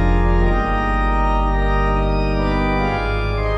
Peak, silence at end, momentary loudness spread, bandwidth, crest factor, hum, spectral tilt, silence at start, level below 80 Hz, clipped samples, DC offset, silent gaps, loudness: -6 dBFS; 0 s; 2 LU; 6 kHz; 10 dB; 50 Hz at -25 dBFS; -8 dB/octave; 0 s; -20 dBFS; under 0.1%; under 0.1%; none; -19 LUFS